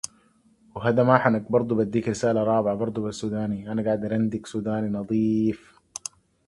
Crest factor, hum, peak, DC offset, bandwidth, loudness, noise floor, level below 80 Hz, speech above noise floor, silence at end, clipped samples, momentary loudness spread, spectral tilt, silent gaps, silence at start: 24 dB; none; -2 dBFS; under 0.1%; 11.5 kHz; -24 LUFS; -60 dBFS; -58 dBFS; 37 dB; 0.9 s; under 0.1%; 16 LU; -6.5 dB/octave; none; 0.05 s